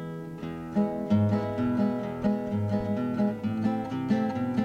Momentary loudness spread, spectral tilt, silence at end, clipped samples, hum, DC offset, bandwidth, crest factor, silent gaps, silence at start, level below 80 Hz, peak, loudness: 6 LU; -9 dB/octave; 0 s; under 0.1%; none; under 0.1%; 7.4 kHz; 14 dB; none; 0 s; -56 dBFS; -14 dBFS; -28 LUFS